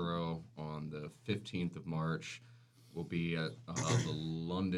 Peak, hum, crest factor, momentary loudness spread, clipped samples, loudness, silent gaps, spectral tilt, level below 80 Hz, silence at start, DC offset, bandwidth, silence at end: -22 dBFS; none; 18 dB; 11 LU; under 0.1%; -39 LUFS; none; -5.5 dB/octave; -66 dBFS; 0 s; under 0.1%; 11.5 kHz; 0 s